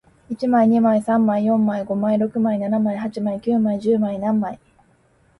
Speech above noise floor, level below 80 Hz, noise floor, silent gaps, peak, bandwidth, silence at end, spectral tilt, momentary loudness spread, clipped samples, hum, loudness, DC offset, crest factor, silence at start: 39 dB; -60 dBFS; -58 dBFS; none; -6 dBFS; 11 kHz; 0.85 s; -9 dB/octave; 8 LU; under 0.1%; none; -20 LUFS; under 0.1%; 14 dB; 0.3 s